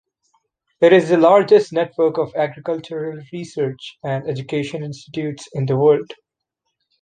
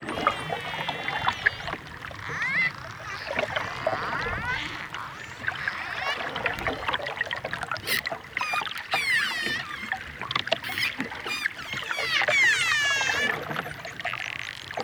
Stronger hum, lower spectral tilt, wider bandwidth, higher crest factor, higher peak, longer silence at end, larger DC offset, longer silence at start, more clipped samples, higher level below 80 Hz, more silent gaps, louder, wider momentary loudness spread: neither; first, -7 dB/octave vs -2 dB/octave; second, 9.4 kHz vs over 20 kHz; second, 18 dB vs 24 dB; first, -2 dBFS vs -6 dBFS; first, 0.9 s vs 0 s; neither; first, 0.8 s vs 0 s; neither; second, -64 dBFS vs -54 dBFS; neither; first, -18 LUFS vs -27 LUFS; first, 16 LU vs 12 LU